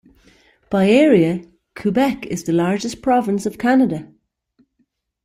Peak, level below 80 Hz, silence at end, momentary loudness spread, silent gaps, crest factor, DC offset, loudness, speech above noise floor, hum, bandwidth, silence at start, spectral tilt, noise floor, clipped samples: -2 dBFS; -54 dBFS; 1.2 s; 11 LU; none; 16 dB; under 0.1%; -18 LUFS; 51 dB; none; 15.5 kHz; 0.7 s; -6.5 dB/octave; -67 dBFS; under 0.1%